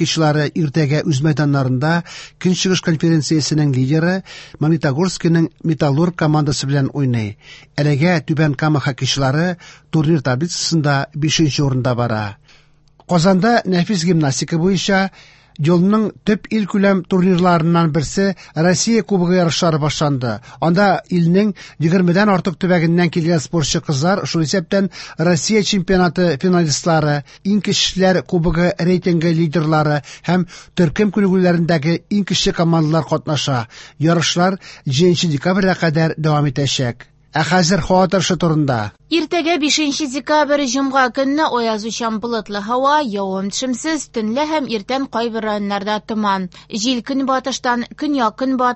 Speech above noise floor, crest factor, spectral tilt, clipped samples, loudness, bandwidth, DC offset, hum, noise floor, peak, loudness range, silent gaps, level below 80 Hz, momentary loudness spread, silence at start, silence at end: 34 dB; 16 dB; -5.5 dB/octave; under 0.1%; -16 LUFS; 8.4 kHz; under 0.1%; none; -50 dBFS; -2 dBFS; 3 LU; none; -44 dBFS; 7 LU; 0 s; 0 s